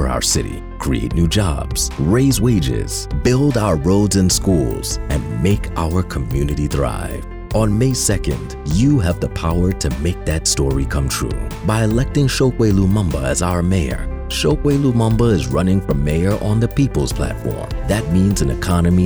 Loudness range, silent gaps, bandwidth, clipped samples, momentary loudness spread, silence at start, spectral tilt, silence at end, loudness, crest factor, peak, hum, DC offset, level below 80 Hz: 2 LU; none; over 20 kHz; under 0.1%; 7 LU; 0 s; -5.5 dB/octave; 0 s; -17 LUFS; 10 dB; -6 dBFS; none; under 0.1%; -26 dBFS